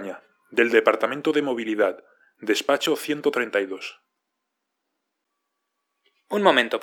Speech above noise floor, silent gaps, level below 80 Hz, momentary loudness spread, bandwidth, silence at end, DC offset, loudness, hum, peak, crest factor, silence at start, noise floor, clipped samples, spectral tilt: 58 dB; none; -82 dBFS; 16 LU; 18.5 kHz; 0 s; under 0.1%; -22 LUFS; none; -2 dBFS; 24 dB; 0 s; -80 dBFS; under 0.1%; -3.5 dB/octave